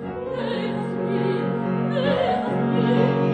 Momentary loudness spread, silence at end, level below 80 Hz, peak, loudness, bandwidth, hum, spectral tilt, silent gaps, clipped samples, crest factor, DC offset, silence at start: 7 LU; 0 s; -54 dBFS; -6 dBFS; -23 LUFS; 9 kHz; none; -8.5 dB/octave; none; under 0.1%; 16 dB; under 0.1%; 0 s